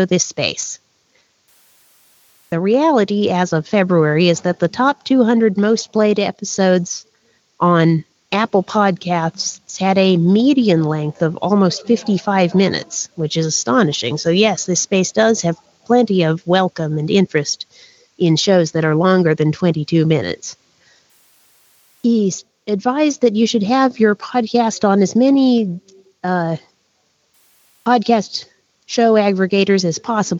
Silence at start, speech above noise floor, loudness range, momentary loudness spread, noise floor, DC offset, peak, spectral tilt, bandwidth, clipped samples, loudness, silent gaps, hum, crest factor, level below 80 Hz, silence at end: 0 s; 47 dB; 4 LU; 10 LU; -62 dBFS; under 0.1%; -2 dBFS; -5 dB/octave; 8 kHz; under 0.1%; -16 LUFS; none; none; 16 dB; -60 dBFS; 0 s